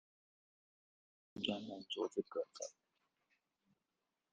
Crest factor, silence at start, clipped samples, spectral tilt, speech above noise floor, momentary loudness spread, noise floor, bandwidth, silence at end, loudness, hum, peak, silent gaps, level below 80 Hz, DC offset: 26 dB; 1.35 s; under 0.1%; -3.5 dB/octave; 46 dB; 9 LU; -90 dBFS; 9.4 kHz; 1.6 s; -44 LUFS; none; -22 dBFS; none; -84 dBFS; under 0.1%